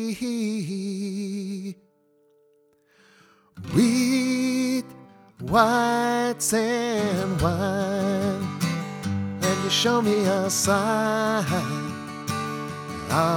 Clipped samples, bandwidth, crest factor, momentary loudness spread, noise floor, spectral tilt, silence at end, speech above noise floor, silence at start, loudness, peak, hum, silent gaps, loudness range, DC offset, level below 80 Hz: under 0.1%; 18.5 kHz; 20 dB; 11 LU; -62 dBFS; -4.5 dB/octave; 0 s; 39 dB; 0 s; -24 LUFS; -4 dBFS; none; none; 6 LU; under 0.1%; -52 dBFS